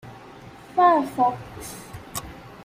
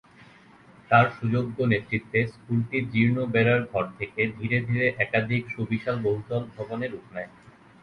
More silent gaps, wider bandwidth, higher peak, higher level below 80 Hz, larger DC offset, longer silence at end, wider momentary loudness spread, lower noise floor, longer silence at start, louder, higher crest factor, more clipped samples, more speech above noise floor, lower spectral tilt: neither; first, 16 kHz vs 5.6 kHz; about the same, -6 dBFS vs -4 dBFS; about the same, -52 dBFS vs -56 dBFS; neither; second, 0 s vs 0.55 s; first, 25 LU vs 11 LU; second, -44 dBFS vs -53 dBFS; second, 0.05 s vs 0.2 s; first, -22 LUFS vs -25 LUFS; about the same, 18 dB vs 22 dB; neither; second, 23 dB vs 27 dB; second, -5 dB/octave vs -8.5 dB/octave